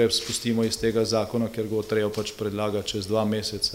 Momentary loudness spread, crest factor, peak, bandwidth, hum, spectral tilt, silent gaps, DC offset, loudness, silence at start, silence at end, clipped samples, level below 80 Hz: 5 LU; 16 dB; -10 dBFS; 16 kHz; none; -4.5 dB/octave; none; under 0.1%; -26 LUFS; 0 s; 0 s; under 0.1%; -52 dBFS